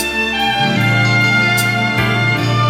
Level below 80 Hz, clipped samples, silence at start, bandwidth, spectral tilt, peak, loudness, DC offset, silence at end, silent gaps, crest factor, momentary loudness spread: -42 dBFS; under 0.1%; 0 s; 16.5 kHz; -4.5 dB/octave; -2 dBFS; -13 LUFS; under 0.1%; 0 s; none; 12 dB; 3 LU